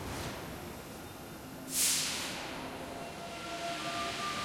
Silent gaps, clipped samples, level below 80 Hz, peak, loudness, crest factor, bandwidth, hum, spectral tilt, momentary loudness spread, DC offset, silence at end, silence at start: none; under 0.1%; -58 dBFS; -16 dBFS; -36 LUFS; 22 dB; 16.5 kHz; none; -1.5 dB/octave; 17 LU; under 0.1%; 0 s; 0 s